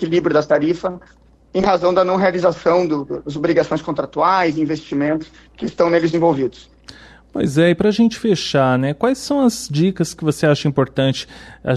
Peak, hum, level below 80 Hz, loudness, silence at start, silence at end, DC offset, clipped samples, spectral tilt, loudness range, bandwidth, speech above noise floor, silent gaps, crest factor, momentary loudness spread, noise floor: -4 dBFS; none; -48 dBFS; -17 LUFS; 0 s; 0 s; under 0.1%; under 0.1%; -6 dB/octave; 2 LU; 13.5 kHz; 25 dB; none; 14 dB; 10 LU; -42 dBFS